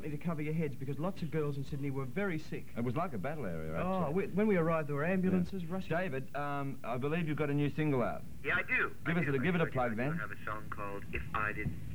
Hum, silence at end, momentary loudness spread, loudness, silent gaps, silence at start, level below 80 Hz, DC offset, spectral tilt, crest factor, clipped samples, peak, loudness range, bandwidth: none; 0 s; 9 LU; -35 LUFS; none; 0 s; -56 dBFS; 0.9%; -8 dB/octave; 16 dB; under 0.1%; -20 dBFS; 4 LU; 17 kHz